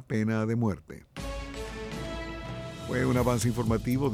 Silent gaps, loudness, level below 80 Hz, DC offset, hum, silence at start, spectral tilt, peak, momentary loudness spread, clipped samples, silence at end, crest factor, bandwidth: none; -30 LUFS; -44 dBFS; under 0.1%; none; 0 s; -6.5 dB/octave; -12 dBFS; 13 LU; under 0.1%; 0 s; 16 dB; 16.5 kHz